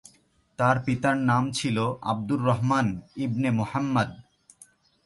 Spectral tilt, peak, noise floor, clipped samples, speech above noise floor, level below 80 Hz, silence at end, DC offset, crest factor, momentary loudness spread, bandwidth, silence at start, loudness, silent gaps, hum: -6.5 dB/octave; -10 dBFS; -63 dBFS; under 0.1%; 38 dB; -56 dBFS; 0.85 s; under 0.1%; 16 dB; 7 LU; 11.5 kHz; 0.6 s; -26 LUFS; none; none